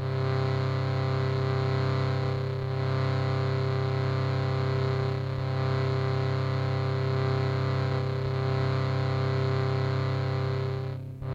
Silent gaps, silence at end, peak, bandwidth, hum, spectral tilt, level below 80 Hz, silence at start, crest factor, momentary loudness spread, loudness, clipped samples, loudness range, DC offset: none; 0 s; -14 dBFS; 7.4 kHz; none; -8 dB/octave; -54 dBFS; 0 s; 14 dB; 3 LU; -28 LUFS; under 0.1%; 0 LU; under 0.1%